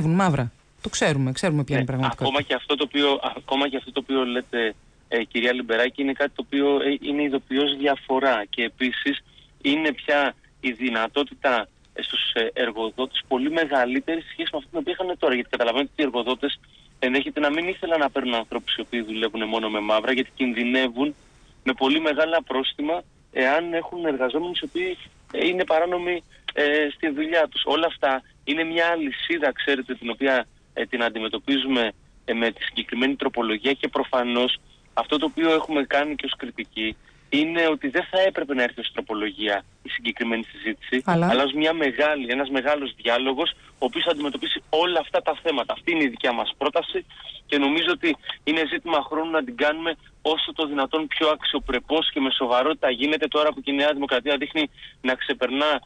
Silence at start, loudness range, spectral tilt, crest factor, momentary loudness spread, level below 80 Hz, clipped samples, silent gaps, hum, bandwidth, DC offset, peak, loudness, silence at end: 0 s; 2 LU; -5 dB/octave; 14 dB; 7 LU; -56 dBFS; under 0.1%; none; none; 10 kHz; under 0.1%; -10 dBFS; -24 LUFS; 0.05 s